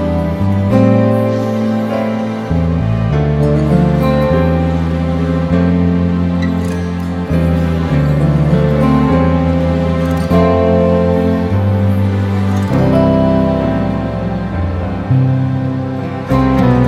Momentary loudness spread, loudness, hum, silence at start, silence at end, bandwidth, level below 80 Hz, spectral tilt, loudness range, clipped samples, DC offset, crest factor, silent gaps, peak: 7 LU; -13 LUFS; none; 0 s; 0 s; 13 kHz; -26 dBFS; -9 dB/octave; 2 LU; under 0.1%; under 0.1%; 12 dB; none; 0 dBFS